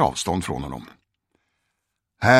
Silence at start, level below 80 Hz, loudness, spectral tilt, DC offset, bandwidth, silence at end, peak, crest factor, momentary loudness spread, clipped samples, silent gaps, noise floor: 0 s; -48 dBFS; -26 LUFS; -4.5 dB/octave; under 0.1%; 16 kHz; 0 s; 0 dBFS; 22 dB; 16 LU; under 0.1%; none; -78 dBFS